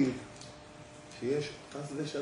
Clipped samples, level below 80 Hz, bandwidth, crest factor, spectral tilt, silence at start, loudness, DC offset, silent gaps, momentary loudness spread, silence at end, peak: under 0.1%; -66 dBFS; 10.5 kHz; 18 dB; -5.5 dB/octave; 0 s; -37 LUFS; under 0.1%; none; 16 LU; 0 s; -18 dBFS